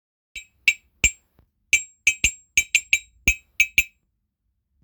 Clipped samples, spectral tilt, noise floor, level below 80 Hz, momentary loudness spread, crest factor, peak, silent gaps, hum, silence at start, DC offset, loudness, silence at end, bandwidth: under 0.1%; 0.5 dB/octave; -75 dBFS; -42 dBFS; 9 LU; 24 dB; -2 dBFS; none; none; 0.35 s; under 0.1%; -20 LUFS; 1 s; over 20 kHz